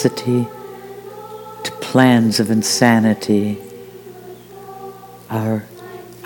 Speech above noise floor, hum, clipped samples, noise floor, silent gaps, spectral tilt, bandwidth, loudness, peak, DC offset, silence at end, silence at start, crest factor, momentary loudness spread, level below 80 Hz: 22 dB; 60 Hz at -40 dBFS; under 0.1%; -37 dBFS; none; -5 dB/octave; 19.5 kHz; -17 LUFS; 0 dBFS; under 0.1%; 0 s; 0 s; 18 dB; 24 LU; -62 dBFS